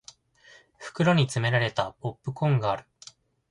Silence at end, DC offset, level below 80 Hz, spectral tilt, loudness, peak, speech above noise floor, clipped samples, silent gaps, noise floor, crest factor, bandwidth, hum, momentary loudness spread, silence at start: 0.7 s; under 0.1%; -60 dBFS; -6 dB/octave; -26 LUFS; -8 dBFS; 31 dB; under 0.1%; none; -56 dBFS; 20 dB; 11.5 kHz; none; 12 LU; 0.8 s